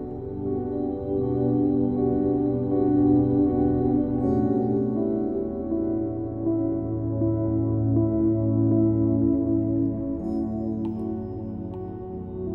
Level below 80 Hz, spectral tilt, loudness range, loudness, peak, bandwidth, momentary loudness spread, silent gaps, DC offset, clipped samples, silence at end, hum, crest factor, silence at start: -44 dBFS; -13.5 dB/octave; 4 LU; -25 LUFS; -10 dBFS; 2.4 kHz; 10 LU; none; under 0.1%; under 0.1%; 0 s; none; 14 dB; 0 s